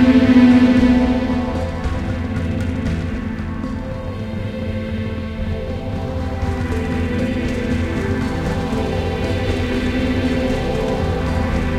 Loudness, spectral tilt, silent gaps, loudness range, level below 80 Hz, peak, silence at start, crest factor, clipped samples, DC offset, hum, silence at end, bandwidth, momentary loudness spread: -19 LUFS; -7.5 dB/octave; none; 7 LU; -28 dBFS; 0 dBFS; 0 s; 18 dB; under 0.1%; under 0.1%; none; 0 s; 11 kHz; 13 LU